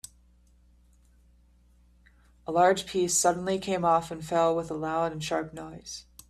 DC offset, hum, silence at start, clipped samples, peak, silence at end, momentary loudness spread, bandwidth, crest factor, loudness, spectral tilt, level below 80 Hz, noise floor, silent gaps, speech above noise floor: under 0.1%; 60 Hz at -55 dBFS; 2.5 s; under 0.1%; -8 dBFS; 0.3 s; 17 LU; 15.5 kHz; 20 dB; -27 LUFS; -3.5 dB/octave; -58 dBFS; -60 dBFS; none; 33 dB